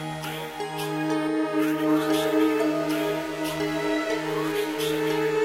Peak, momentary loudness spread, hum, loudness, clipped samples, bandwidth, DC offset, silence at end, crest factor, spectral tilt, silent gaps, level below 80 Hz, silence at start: -12 dBFS; 8 LU; none; -26 LUFS; under 0.1%; 16 kHz; under 0.1%; 0 s; 14 dB; -5 dB/octave; none; -62 dBFS; 0 s